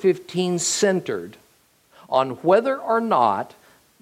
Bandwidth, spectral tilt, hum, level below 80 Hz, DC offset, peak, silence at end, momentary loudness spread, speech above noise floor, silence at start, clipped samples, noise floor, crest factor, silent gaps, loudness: 16 kHz; -4 dB/octave; none; -70 dBFS; under 0.1%; -4 dBFS; 0.55 s; 12 LU; 39 dB; 0 s; under 0.1%; -59 dBFS; 18 dB; none; -21 LUFS